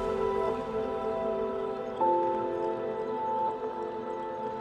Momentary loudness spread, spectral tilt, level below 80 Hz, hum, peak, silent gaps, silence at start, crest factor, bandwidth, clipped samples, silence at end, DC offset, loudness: 8 LU; -7 dB/octave; -56 dBFS; none; -16 dBFS; none; 0 s; 16 dB; 9.4 kHz; under 0.1%; 0 s; under 0.1%; -31 LUFS